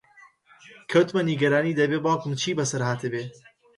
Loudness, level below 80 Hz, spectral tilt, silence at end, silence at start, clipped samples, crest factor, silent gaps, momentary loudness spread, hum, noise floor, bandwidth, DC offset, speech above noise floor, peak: -24 LUFS; -68 dBFS; -5 dB/octave; 0.45 s; 0.7 s; under 0.1%; 18 dB; none; 10 LU; none; -55 dBFS; 11.5 kHz; under 0.1%; 31 dB; -8 dBFS